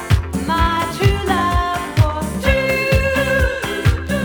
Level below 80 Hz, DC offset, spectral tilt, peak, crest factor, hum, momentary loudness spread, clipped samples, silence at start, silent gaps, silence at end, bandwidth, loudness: -24 dBFS; under 0.1%; -5.5 dB/octave; 0 dBFS; 16 dB; none; 3 LU; under 0.1%; 0 s; none; 0 s; over 20 kHz; -17 LUFS